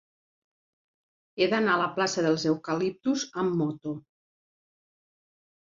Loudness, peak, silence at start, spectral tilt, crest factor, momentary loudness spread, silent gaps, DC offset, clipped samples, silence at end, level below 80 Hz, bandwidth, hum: -27 LUFS; -10 dBFS; 1.35 s; -5 dB/octave; 20 dB; 12 LU; none; under 0.1%; under 0.1%; 1.8 s; -72 dBFS; 7.6 kHz; none